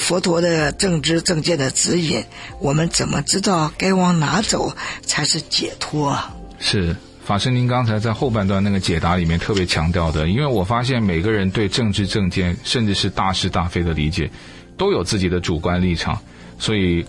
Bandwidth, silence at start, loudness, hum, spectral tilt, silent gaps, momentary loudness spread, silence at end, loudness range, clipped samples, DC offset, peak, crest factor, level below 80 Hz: 12 kHz; 0 s; -19 LUFS; none; -4.5 dB/octave; none; 6 LU; 0 s; 2 LU; under 0.1%; under 0.1%; -2 dBFS; 16 dB; -38 dBFS